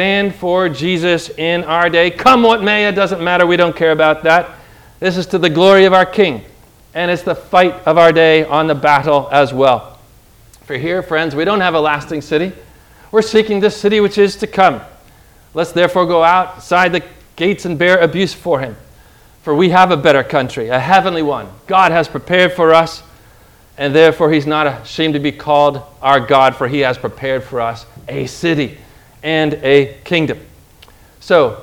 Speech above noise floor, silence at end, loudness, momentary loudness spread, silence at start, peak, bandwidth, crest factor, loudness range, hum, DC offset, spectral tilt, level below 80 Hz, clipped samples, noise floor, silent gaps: 32 dB; 0 s; -13 LUFS; 10 LU; 0 s; 0 dBFS; 17.5 kHz; 14 dB; 5 LU; none; under 0.1%; -5.5 dB/octave; -46 dBFS; 0.4%; -44 dBFS; none